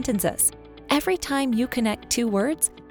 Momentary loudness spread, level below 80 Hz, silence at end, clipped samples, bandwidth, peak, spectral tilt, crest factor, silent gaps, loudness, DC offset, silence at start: 3 LU; -48 dBFS; 0 s; under 0.1%; over 20 kHz; -6 dBFS; -3 dB/octave; 18 dB; none; -23 LUFS; under 0.1%; 0 s